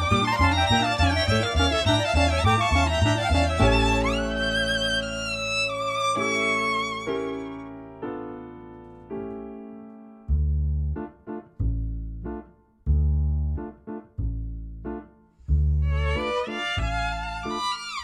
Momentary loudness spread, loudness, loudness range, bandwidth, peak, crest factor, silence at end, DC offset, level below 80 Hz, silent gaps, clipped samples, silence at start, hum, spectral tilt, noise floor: 17 LU; -24 LUFS; 10 LU; 12 kHz; -8 dBFS; 18 dB; 0 s; under 0.1%; -30 dBFS; none; under 0.1%; 0 s; none; -5 dB/octave; -48 dBFS